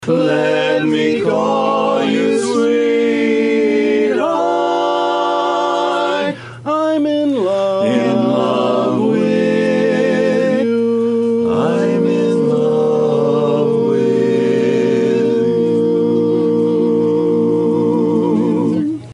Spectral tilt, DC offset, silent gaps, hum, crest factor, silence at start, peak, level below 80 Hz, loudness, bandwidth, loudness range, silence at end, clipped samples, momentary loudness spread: -6.5 dB/octave; under 0.1%; none; none; 12 dB; 0 s; -2 dBFS; -62 dBFS; -15 LUFS; 11 kHz; 2 LU; 0 s; under 0.1%; 2 LU